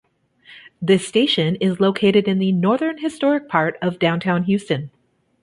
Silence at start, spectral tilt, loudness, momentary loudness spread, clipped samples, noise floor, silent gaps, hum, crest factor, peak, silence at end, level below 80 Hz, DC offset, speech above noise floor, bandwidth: 0.5 s; -6 dB/octave; -19 LUFS; 7 LU; under 0.1%; -50 dBFS; none; none; 18 dB; -2 dBFS; 0.55 s; -60 dBFS; under 0.1%; 32 dB; 11.5 kHz